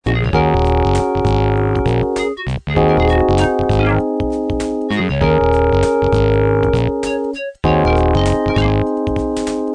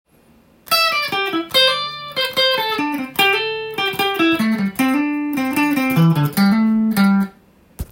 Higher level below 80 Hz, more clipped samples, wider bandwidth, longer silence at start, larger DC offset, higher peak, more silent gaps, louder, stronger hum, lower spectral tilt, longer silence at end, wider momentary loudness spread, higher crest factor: first, -24 dBFS vs -46 dBFS; neither; second, 10 kHz vs 17 kHz; second, 0.05 s vs 0.65 s; neither; about the same, 0 dBFS vs -2 dBFS; neither; about the same, -16 LUFS vs -17 LUFS; neither; first, -7 dB/octave vs -5 dB/octave; about the same, 0 s vs 0.05 s; about the same, 6 LU vs 6 LU; about the same, 14 dB vs 16 dB